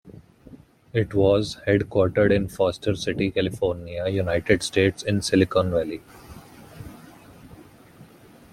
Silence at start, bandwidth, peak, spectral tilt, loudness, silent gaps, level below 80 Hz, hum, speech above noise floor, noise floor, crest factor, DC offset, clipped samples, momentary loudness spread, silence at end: 0.05 s; 15 kHz; -4 dBFS; -6 dB/octave; -23 LUFS; none; -48 dBFS; none; 27 dB; -49 dBFS; 20 dB; under 0.1%; under 0.1%; 14 LU; 0.5 s